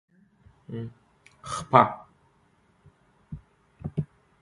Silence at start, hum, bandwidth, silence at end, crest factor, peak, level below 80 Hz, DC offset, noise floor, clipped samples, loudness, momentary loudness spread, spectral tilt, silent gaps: 0.7 s; none; 11.5 kHz; 0.35 s; 30 dB; 0 dBFS; -56 dBFS; under 0.1%; -64 dBFS; under 0.1%; -26 LUFS; 25 LU; -6 dB/octave; none